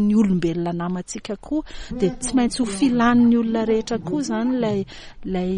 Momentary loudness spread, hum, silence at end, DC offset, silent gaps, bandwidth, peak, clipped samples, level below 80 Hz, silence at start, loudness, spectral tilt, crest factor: 12 LU; none; 0 s; under 0.1%; none; 10.5 kHz; -6 dBFS; under 0.1%; -42 dBFS; 0 s; -21 LUFS; -6 dB/octave; 14 dB